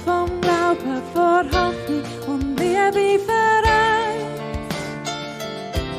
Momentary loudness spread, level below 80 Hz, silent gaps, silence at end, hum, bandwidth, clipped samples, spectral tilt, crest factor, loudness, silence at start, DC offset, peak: 12 LU; -36 dBFS; none; 0 s; none; 15.5 kHz; under 0.1%; -5 dB/octave; 14 dB; -20 LUFS; 0 s; under 0.1%; -6 dBFS